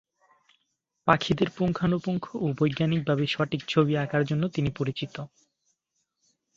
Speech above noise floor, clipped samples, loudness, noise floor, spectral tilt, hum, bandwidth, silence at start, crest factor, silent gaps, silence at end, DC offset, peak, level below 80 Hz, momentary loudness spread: 52 dB; under 0.1%; -27 LUFS; -79 dBFS; -7 dB/octave; none; 7.6 kHz; 1.05 s; 24 dB; none; 1.3 s; under 0.1%; -4 dBFS; -56 dBFS; 7 LU